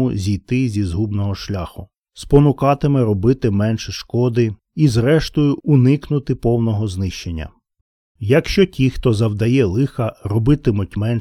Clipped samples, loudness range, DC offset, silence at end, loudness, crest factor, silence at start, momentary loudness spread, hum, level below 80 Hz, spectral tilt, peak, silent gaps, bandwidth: under 0.1%; 2 LU; under 0.1%; 0 s; -17 LUFS; 16 dB; 0 s; 10 LU; none; -34 dBFS; -7.5 dB/octave; 0 dBFS; 1.98-2.02 s, 7.81-8.15 s; 12.5 kHz